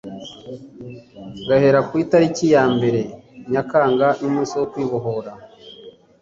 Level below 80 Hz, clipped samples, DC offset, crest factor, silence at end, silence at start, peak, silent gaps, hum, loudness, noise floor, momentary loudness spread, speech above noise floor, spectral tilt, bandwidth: -56 dBFS; under 0.1%; under 0.1%; 18 dB; 0.3 s; 0.05 s; -2 dBFS; none; none; -18 LUFS; -43 dBFS; 22 LU; 25 dB; -6.5 dB/octave; 7.8 kHz